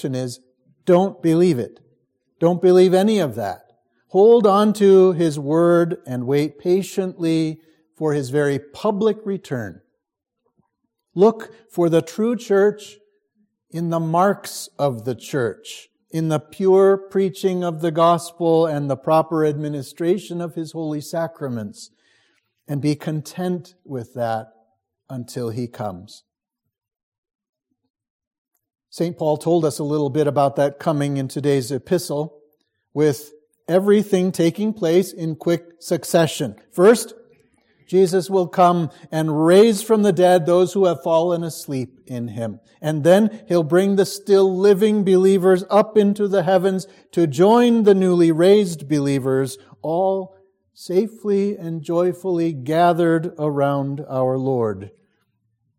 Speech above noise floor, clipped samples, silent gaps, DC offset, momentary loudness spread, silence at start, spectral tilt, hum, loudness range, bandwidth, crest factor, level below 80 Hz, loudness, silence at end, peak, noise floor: 63 dB; under 0.1%; 27.03-27.12 s, 27.18-27.23 s, 27.35-27.39 s, 27.49-27.53 s, 27.90-27.94 s, 28.10-28.19 s, 28.27-28.31 s, 28.38-28.45 s; under 0.1%; 14 LU; 0 s; -6.5 dB/octave; none; 11 LU; 16.5 kHz; 18 dB; -68 dBFS; -19 LUFS; 0.9 s; -2 dBFS; -81 dBFS